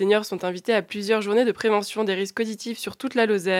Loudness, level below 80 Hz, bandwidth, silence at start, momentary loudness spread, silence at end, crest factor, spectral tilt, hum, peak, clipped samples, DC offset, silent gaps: -24 LUFS; -74 dBFS; 16 kHz; 0 s; 8 LU; 0 s; 16 dB; -4.5 dB/octave; none; -6 dBFS; under 0.1%; under 0.1%; none